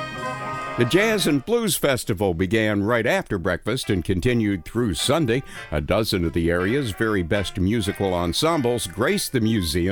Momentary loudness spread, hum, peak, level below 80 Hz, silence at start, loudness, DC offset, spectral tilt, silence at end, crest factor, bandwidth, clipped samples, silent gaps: 5 LU; none; -6 dBFS; -40 dBFS; 0 s; -22 LUFS; under 0.1%; -5 dB/octave; 0 s; 16 dB; over 20 kHz; under 0.1%; none